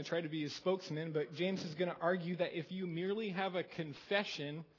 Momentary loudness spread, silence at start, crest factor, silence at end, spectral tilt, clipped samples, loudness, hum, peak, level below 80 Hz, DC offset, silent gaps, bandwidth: 5 LU; 0 s; 20 dB; 0.15 s; -6 dB/octave; under 0.1%; -39 LUFS; none; -18 dBFS; -82 dBFS; under 0.1%; none; 6 kHz